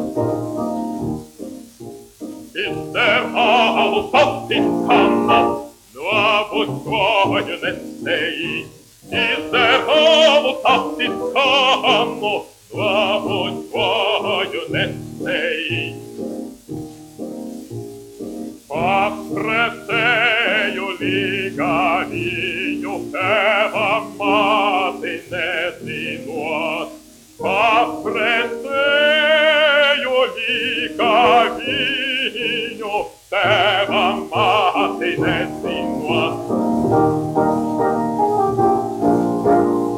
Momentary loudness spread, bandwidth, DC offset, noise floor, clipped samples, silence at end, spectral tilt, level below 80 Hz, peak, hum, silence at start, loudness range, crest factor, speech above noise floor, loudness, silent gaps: 15 LU; 16.5 kHz; under 0.1%; -41 dBFS; under 0.1%; 0 s; -4.5 dB/octave; -52 dBFS; -2 dBFS; none; 0 s; 7 LU; 16 dB; 24 dB; -17 LUFS; none